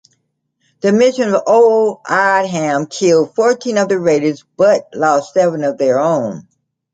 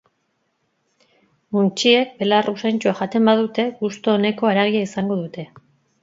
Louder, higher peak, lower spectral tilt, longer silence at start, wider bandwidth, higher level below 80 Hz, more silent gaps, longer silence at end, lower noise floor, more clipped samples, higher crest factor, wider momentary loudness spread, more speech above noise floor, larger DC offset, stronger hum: first, -14 LUFS vs -19 LUFS; about the same, -2 dBFS vs -2 dBFS; about the same, -5 dB/octave vs -5.5 dB/octave; second, 0.85 s vs 1.5 s; first, 9.2 kHz vs 7.8 kHz; about the same, -64 dBFS vs -68 dBFS; neither; about the same, 0.55 s vs 0.6 s; about the same, -67 dBFS vs -70 dBFS; neither; second, 12 dB vs 20 dB; second, 6 LU vs 9 LU; about the same, 54 dB vs 51 dB; neither; neither